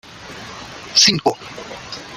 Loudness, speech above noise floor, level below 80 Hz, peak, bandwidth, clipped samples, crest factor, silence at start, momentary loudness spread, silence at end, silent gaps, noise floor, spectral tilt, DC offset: -14 LUFS; 17 dB; -54 dBFS; -2 dBFS; 16 kHz; under 0.1%; 20 dB; 0.15 s; 21 LU; 0 s; none; -35 dBFS; -1.5 dB/octave; under 0.1%